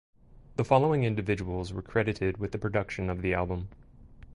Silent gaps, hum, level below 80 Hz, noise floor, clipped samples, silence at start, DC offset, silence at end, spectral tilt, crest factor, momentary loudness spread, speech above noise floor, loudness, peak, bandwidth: none; none; -46 dBFS; -51 dBFS; under 0.1%; 0.6 s; under 0.1%; 0 s; -7.5 dB/octave; 20 dB; 11 LU; 22 dB; -30 LUFS; -10 dBFS; 11 kHz